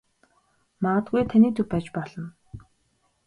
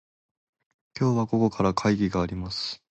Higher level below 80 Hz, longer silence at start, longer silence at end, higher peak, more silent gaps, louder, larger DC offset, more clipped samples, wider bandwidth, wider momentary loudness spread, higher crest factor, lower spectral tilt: second, -54 dBFS vs -48 dBFS; second, 0.8 s vs 0.95 s; first, 0.65 s vs 0.15 s; about the same, -8 dBFS vs -8 dBFS; neither; first, -23 LUFS vs -26 LUFS; neither; neither; first, 10 kHz vs 8.4 kHz; first, 18 LU vs 7 LU; about the same, 18 dB vs 18 dB; first, -9 dB/octave vs -6.5 dB/octave